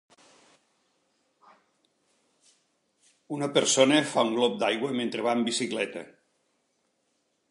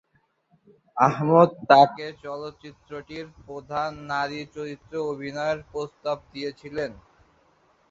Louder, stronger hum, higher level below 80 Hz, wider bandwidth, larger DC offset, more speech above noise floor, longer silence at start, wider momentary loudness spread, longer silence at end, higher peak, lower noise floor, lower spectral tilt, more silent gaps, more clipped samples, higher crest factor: about the same, -26 LUFS vs -24 LUFS; neither; second, -82 dBFS vs -60 dBFS; first, 11.5 kHz vs 7.6 kHz; neither; first, 49 dB vs 42 dB; first, 3.3 s vs 0.95 s; second, 12 LU vs 22 LU; first, 1.45 s vs 0.95 s; second, -6 dBFS vs -2 dBFS; first, -74 dBFS vs -67 dBFS; second, -3 dB/octave vs -6.5 dB/octave; neither; neither; about the same, 24 dB vs 24 dB